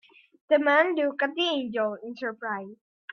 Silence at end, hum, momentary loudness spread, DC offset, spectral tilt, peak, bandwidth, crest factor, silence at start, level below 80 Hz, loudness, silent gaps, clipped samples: 0.4 s; none; 13 LU; under 0.1%; -4.5 dB/octave; -8 dBFS; 6.4 kHz; 20 dB; 0.5 s; -78 dBFS; -26 LUFS; none; under 0.1%